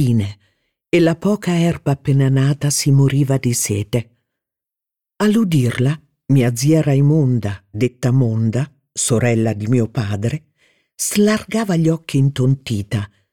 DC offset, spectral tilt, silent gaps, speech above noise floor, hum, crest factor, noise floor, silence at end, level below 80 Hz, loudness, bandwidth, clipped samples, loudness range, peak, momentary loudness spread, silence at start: 0.3%; -6 dB/octave; none; 70 dB; none; 14 dB; -86 dBFS; 0.25 s; -50 dBFS; -17 LUFS; 16.5 kHz; under 0.1%; 3 LU; -2 dBFS; 8 LU; 0 s